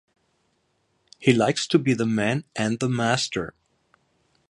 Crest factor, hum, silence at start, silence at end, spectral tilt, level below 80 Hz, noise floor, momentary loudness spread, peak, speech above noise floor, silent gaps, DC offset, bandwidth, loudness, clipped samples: 22 dB; none; 1.2 s; 1 s; -5 dB/octave; -60 dBFS; -70 dBFS; 7 LU; -2 dBFS; 47 dB; none; under 0.1%; 11.5 kHz; -23 LUFS; under 0.1%